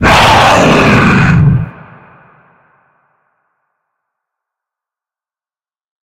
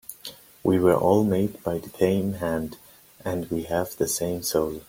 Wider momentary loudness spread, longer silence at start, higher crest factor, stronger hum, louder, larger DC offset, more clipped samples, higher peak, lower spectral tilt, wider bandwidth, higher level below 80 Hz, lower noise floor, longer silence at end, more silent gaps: second, 8 LU vs 15 LU; about the same, 0 s vs 0.1 s; second, 12 dB vs 18 dB; neither; first, -7 LUFS vs -25 LUFS; neither; first, 0.1% vs under 0.1%; first, 0 dBFS vs -6 dBFS; about the same, -5.5 dB/octave vs -5.5 dB/octave; about the same, 16 kHz vs 16.5 kHz; first, -30 dBFS vs -54 dBFS; first, under -90 dBFS vs -44 dBFS; first, 4.35 s vs 0.05 s; neither